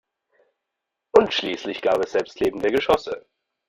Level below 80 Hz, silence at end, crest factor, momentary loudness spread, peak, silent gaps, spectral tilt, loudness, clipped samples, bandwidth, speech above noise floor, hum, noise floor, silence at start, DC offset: -54 dBFS; 0.5 s; 22 dB; 9 LU; -2 dBFS; none; -4.5 dB/octave; -22 LUFS; under 0.1%; 15 kHz; 60 dB; none; -83 dBFS; 1.15 s; under 0.1%